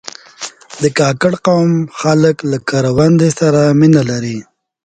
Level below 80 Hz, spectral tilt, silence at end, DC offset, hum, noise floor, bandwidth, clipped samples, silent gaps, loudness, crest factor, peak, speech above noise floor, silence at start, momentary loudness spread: -46 dBFS; -6.5 dB/octave; 0.45 s; under 0.1%; none; -31 dBFS; 9.4 kHz; under 0.1%; none; -12 LUFS; 12 dB; 0 dBFS; 20 dB; 0.4 s; 17 LU